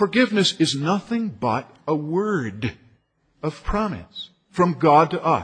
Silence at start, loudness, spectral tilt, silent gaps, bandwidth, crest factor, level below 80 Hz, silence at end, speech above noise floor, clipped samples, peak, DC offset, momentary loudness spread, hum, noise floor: 0 s; -22 LUFS; -5.5 dB/octave; none; 10 kHz; 18 dB; -42 dBFS; 0 s; 41 dB; under 0.1%; -4 dBFS; under 0.1%; 15 LU; none; -62 dBFS